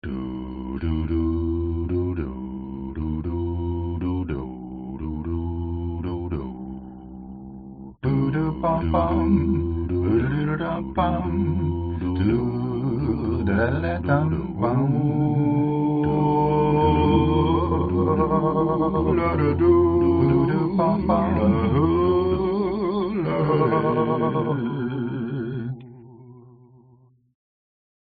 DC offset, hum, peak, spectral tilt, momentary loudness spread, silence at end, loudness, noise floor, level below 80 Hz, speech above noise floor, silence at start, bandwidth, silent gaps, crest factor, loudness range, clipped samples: under 0.1%; none; -6 dBFS; -8 dB/octave; 12 LU; 1.65 s; -23 LUFS; -56 dBFS; -40 dBFS; 35 dB; 0.05 s; 4.8 kHz; none; 16 dB; 9 LU; under 0.1%